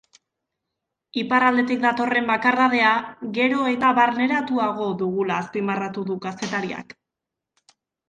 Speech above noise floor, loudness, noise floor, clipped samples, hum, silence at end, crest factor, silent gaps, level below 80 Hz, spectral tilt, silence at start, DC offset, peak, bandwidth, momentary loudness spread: 64 dB; -21 LUFS; -85 dBFS; under 0.1%; none; 1.25 s; 18 dB; none; -66 dBFS; -5.5 dB/octave; 1.15 s; under 0.1%; -4 dBFS; 9.2 kHz; 11 LU